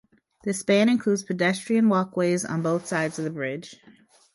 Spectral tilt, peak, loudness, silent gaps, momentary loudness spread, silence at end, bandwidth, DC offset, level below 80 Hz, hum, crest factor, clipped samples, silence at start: -5.5 dB/octave; -8 dBFS; -24 LUFS; none; 11 LU; 0.6 s; 11.5 kHz; under 0.1%; -68 dBFS; none; 16 dB; under 0.1%; 0.45 s